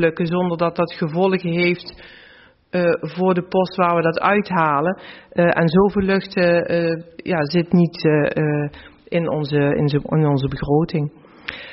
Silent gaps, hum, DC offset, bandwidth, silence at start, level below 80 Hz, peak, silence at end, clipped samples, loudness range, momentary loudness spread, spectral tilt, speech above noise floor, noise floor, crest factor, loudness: none; none; under 0.1%; 5.8 kHz; 0 s; -48 dBFS; -4 dBFS; 0 s; under 0.1%; 3 LU; 9 LU; -6 dB/octave; 30 dB; -49 dBFS; 14 dB; -19 LUFS